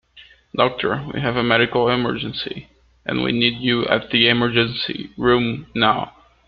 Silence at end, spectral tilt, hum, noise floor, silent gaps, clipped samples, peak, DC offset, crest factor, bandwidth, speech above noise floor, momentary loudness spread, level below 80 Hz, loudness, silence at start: 0.4 s; -8 dB/octave; none; -49 dBFS; none; under 0.1%; -2 dBFS; under 0.1%; 20 dB; 5.4 kHz; 29 dB; 11 LU; -48 dBFS; -19 LUFS; 0.15 s